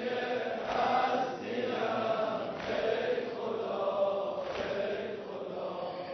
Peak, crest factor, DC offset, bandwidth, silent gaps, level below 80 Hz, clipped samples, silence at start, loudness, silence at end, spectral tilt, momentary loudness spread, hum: -18 dBFS; 16 dB; under 0.1%; 6.2 kHz; none; -66 dBFS; under 0.1%; 0 s; -33 LUFS; 0 s; -2.5 dB/octave; 8 LU; none